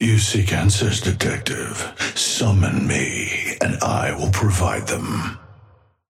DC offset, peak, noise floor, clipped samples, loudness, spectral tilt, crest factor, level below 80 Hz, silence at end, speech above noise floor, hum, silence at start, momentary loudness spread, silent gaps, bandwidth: under 0.1%; -4 dBFS; -52 dBFS; under 0.1%; -20 LUFS; -4 dB/octave; 16 dB; -40 dBFS; 0.6 s; 32 dB; none; 0 s; 8 LU; none; 15.5 kHz